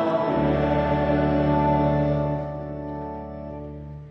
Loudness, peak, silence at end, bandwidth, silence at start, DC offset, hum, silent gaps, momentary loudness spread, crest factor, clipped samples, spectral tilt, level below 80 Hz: -23 LUFS; -10 dBFS; 0 s; 5.8 kHz; 0 s; under 0.1%; none; none; 15 LU; 14 dB; under 0.1%; -10 dB/octave; -38 dBFS